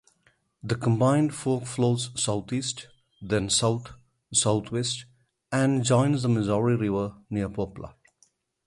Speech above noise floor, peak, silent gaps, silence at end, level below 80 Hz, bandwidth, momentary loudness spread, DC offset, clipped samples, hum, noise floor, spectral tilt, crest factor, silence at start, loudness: 41 dB; -8 dBFS; none; 0.75 s; -54 dBFS; 11.5 kHz; 11 LU; under 0.1%; under 0.1%; none; -67 dBFS; -5 dB/octave; 18 dB; 0.65 s; -26 LUFS